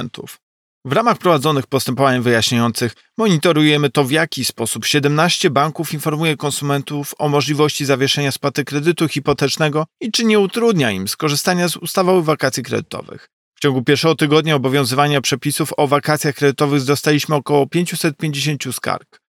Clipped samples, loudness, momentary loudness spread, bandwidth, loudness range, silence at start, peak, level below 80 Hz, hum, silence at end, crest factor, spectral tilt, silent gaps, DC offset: under 0.1%; -16 LUFS; 7 LU; 17.5 kHz; 2 LU; 0 s; -2 dBFS; -60 dBFS; none; 0.3 s; 14 dB; -4.5 dB/octave; 0.42-0.81 s, 13.33-13.52 s; under 0.1%